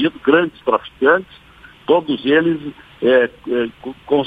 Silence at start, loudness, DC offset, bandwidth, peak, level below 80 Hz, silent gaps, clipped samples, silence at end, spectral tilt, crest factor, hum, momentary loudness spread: 0 s; -17 LUFS; under 0.1%; 4.9 kHz; 0 dBFS; -54 dBFS; none; under 0.1%; 0 s; -7.5 dB/octave; 18 dB; none; 11 LU